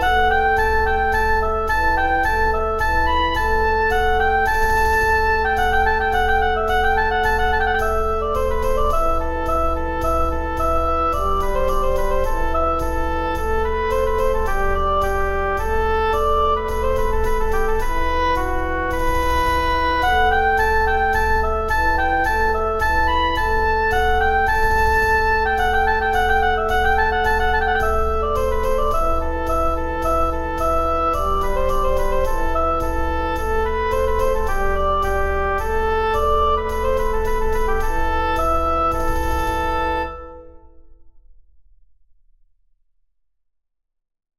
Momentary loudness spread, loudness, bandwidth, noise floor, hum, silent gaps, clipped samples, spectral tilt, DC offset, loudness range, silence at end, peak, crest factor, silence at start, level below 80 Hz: 5 LU; -19 LUFS; 15 kHz; -76 dBFS; none; none; under 0.1%; -5 dB/octave; 0.3%; 4 LU; 3.3 s; -4 dBFS; 14 dB; 0 s; -24 dBFS